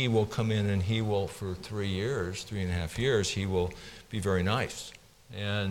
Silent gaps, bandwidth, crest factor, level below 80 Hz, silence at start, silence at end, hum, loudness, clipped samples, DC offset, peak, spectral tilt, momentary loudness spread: none; 16 kHz; 16 dB; -52 dBFS; 0 s; 0 s; none; -31 LUFS; under 0.1%; under 0.1%; -14 dBFS; -5.5 dB/octave; 10 LU